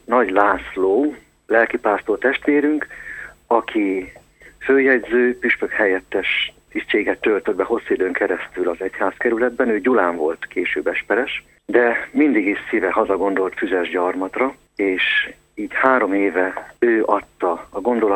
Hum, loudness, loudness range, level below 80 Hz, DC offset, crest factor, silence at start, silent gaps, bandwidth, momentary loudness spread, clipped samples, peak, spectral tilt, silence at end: none; -19 LUFS; 2 LU; -54 dBFS; under 0.1%; 18 dB; 0.1 s; none; 8.4 kHz; 7 LU; under 0.1%; 0 dBFS; -5 dB/octave; 0 s